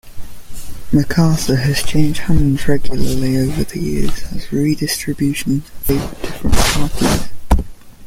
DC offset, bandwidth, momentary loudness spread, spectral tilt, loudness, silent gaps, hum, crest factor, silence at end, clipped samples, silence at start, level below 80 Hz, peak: under 0.1%; 16.5 kHz; 9 LU; -5.5 dB/octave; -17 LUFS; none; none; 14 dB; 0 s; under 0.1%; 0.05 s; -24 dBFS; 0 dBFS